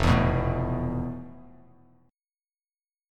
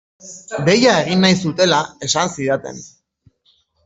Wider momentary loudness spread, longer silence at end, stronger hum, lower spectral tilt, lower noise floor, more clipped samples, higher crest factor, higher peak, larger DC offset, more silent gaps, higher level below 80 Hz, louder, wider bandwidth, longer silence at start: second, 17 LU vs 20 LU; first, 1.65 s vs 1 s; neither; first, -7.5 dB/octave vs -4 dB/octave; first, under -90 dBFS vs -60 dBFS; neither; about the same, 20 dB vs 16 dB; second, -10 dBFS vs -2 dBFS; neither; neither; first, -38 dBFS vs -56 dBFS; second, -27 LUFS vs -16 LUFS; first, 12 kHz vs 8 kHz; second, 0 s vs 0.25 s